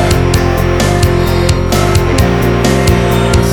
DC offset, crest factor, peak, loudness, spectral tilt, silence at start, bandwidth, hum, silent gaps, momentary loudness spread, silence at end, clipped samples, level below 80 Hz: under 0.1%; 10 dB; 0 dBFS; -11 LUFS; -5.5 dB/octave; 0 s; 19.5 kHz; none; none; 1 LU; 0 s; under 0.1%; -18 dBFS